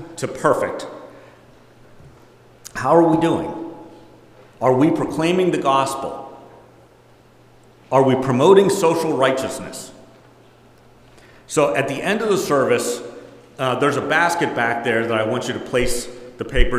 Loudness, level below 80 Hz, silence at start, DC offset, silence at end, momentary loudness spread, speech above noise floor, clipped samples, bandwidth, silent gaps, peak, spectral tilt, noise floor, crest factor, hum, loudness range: -19 LUFS; -36 dBFS; 0 s; under 0.1%; 0 s; 17 LU; 32 dB; under 0.1%; 16 kHz; none; 0 dBFS; -5 dB/octave; -50 dBFS; 20 dB; none; 4 LU